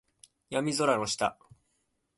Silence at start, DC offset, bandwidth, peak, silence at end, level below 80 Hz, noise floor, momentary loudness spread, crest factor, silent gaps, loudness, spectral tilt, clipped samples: 0.5 s; under 0.1%; 12 kHz; -12 dBFS; 0.85 s; -68 dBFS; -77 dBFS; 6 LU; 22 dB; none; -29 LUFS; -3.5 dB/octave; under 0.1%